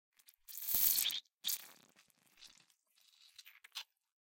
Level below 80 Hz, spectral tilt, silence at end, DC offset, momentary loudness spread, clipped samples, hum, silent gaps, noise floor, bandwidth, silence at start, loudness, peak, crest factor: -78 dBFS; 2.5 dB/octave; 0.45 s; under 0.1%; 28 LU; under 0.1%; none; 1.34-1.38 s; -73 dBFS; 17 kHz; 0.5 s; -34 LUFS; -16 dBFS; 26 dB